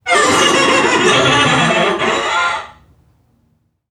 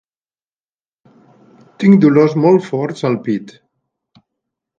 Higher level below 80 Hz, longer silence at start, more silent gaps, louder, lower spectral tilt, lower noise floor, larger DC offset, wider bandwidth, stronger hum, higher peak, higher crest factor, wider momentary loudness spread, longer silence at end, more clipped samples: first, -46 dBFS vs -62 dBFS; second, 0.05 s vs 1.8 s; neither; about the same, -12 LUFS vs -13 LUFS; second, -3 dB/octave vs -8.5 dB/octave; second, -60 dBFS vs under -90 dBFS; neither; first, 15.5 kHz vs 7.6 kHz; neither; about the same, 0 dBFS vs 0 dBFS; about the same, 14 dB vs 16 dB; second, 5 LU vs 12 LU; about the same, 1.2 s vs 1.3 s; neither